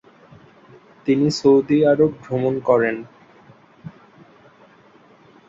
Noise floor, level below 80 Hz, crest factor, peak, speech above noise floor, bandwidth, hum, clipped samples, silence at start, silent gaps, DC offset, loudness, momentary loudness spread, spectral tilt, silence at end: -51 dBFS; -60 dBFS; 18 dB; -2 dBFS; 34 dB; 7.8 kHz; none; under 0.1%; 1.05 s; none; under 0.1%; -18 LUFS; 26 LU; -6.5 dB/octave; 1.6 s